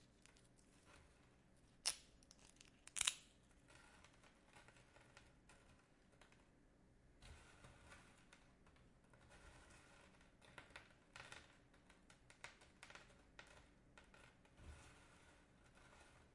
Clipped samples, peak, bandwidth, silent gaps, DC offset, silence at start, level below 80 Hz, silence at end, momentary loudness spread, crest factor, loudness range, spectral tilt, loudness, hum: under 0.1%; -18 dBFS; 12 kHz; none; under 0.1%; 0 s; -74 dBFS; 0 s; 23 LU; 40 dB; 19 LU; -0.5 dB/octave; -51 LUFS; none